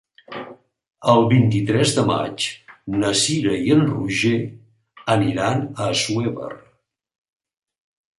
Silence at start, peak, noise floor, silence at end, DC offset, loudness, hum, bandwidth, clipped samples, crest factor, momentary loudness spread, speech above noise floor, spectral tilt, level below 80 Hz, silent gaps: 0.3 s; -2 dBFS; -63 dBFS; 1.6 s; under 0.1%; -19 LUFS; none; 11.5 kHz; under 0.1%; 18 dB; 18 LU; 44 dB; -5 dB/octave; -54 dBFS; none